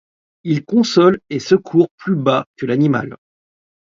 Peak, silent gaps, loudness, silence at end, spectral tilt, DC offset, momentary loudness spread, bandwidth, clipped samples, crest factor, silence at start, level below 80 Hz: 0 dBFS; 1.91-1.98 s, 2.46-2.54 s; -16 LUFS; 0.75 s; -6.5 dB/octave; under 0.1%; 9 LU; 7.6 kHz; under 0.1%; 16 dB; 0.45 s; -58 dBFS